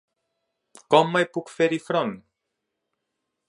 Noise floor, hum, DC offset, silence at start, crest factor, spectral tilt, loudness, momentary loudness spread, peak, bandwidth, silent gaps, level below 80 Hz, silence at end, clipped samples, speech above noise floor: -81 dBFS; none; under 0.1%; 0.9 s; 24 dB; -5.5 dB/octave; -23 LUFS; 11 LU; -2 dBFS; 11.5 kHz; none; -74 dBFS; 1.3 s; under 0.1%; 59 dB